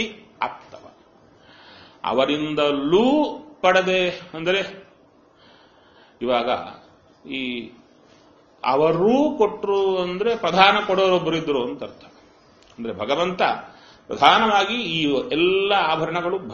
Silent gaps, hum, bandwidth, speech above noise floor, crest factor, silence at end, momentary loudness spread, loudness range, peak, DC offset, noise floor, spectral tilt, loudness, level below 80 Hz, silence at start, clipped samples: none; none; 7 kHz; 34 dB; 22 dB; 0 s; 15 LU; 8 LU; 0 dBFS; under 0.1%; -54 dBFS; -2.5 dB/octave; -20 LUFS; -58 dBFS; 0 s; under 0.1%